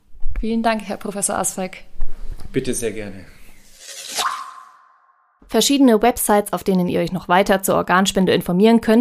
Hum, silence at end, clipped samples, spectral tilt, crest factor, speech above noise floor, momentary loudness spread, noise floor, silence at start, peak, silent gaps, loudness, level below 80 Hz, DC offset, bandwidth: none; 0 s; under 0.1%; -4.5 dB/octave; 16 dB; 40 dB; 20 LU; -57 dBFS; 0.1 s; -2 dBFS; none; -18 LUFS; -32 dBFS; under 0.1%; 15.5 kHz